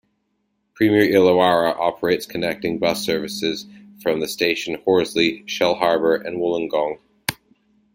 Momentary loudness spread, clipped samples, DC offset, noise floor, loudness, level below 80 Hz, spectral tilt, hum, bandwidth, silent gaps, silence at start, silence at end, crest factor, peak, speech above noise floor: 11 LU; under 0.1%; under 0.1%; -71 dBFS; -20 LUFS; -58 dBFS; -4.5 dB/octave; none; 16.5 kHz; none; 0.75 s; 0.6 s; 20 dB; 0 dBFS; 51 dB